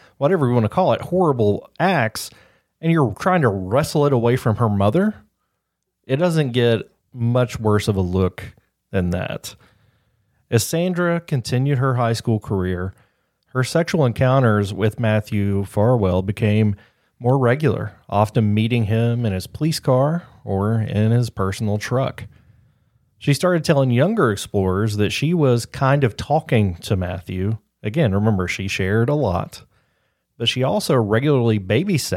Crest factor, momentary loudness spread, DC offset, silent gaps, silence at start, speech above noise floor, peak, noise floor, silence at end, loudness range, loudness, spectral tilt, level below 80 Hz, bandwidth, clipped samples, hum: 18 dB; 8 LU; under 0.1%; none; 0.2 s; 57 dB; -2 dBFS; -76 dBFS; 0 s; 3 LU; -20 LUFS; -6.5 dB/octave; -50 dBFS; 16 kHz; under 0.1%; none